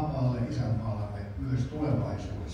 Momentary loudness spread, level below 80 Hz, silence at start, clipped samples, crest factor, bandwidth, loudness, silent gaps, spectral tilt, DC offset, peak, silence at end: 7 LU; -44 dBFS; 0 s; under 0.1%; 14 dB; 7.6 kHz; -32 LUFS; none; -8.5 dB/octave; under 0.1%; -16 dBFS; 0 s